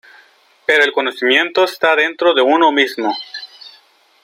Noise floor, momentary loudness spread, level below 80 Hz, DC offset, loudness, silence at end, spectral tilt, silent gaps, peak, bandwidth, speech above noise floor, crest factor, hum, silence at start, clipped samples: -51 dBFS; 13 LU; -70 dBFS; under 0.1%; -14 LUFS; 0.55 s; -2.5 dB/octave; none; 0 dBFS; 16 kHz; 37 dB; 16 dB; none; 0.7 s; under 0.1%